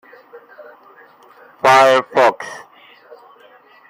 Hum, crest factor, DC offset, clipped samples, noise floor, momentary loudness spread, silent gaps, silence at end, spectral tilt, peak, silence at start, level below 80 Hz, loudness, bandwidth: none; 18 dB; under 0.1%; under 0.1%; -47 dBFS; 21 LU; none; 1.3 s; -3 dB/octave; 0 dBFS; 1.65 s; -70 dBFS; -13 LUFS; 16 kHz